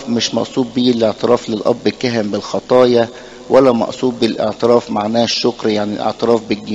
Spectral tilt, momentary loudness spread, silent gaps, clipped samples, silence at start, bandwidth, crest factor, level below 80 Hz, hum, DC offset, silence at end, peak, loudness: -5 dB/octave; 7 LU; none; under 0.1%; 0 s; 9.2 kHz; 14 dB; -52 dBFS; none; under 0.1%; 0 s; 0 dBFS; -15 LUFS